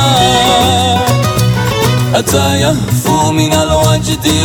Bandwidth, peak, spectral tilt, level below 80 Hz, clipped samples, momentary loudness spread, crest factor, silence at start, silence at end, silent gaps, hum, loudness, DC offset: 19.5 kHz; 0 dBFS; -4.5 dB/octave; -28 dBFS; under 0.1%; 4 LU; 10 dB; 0 s; 0 s; none; none; -10 LUFS; under 0.1%